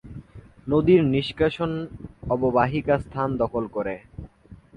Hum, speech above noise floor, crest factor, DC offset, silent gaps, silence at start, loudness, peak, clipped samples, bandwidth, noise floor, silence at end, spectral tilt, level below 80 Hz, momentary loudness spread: none; 26 dB; 18 dB; under 0.1%; none; 0.05 s; -23 LUFS; -6 dBFS; under 0.1%; 9.2 kHz; -49 dBFS; 0.2 s; -8.5 dB/octave; -46 dBFS; 21 LU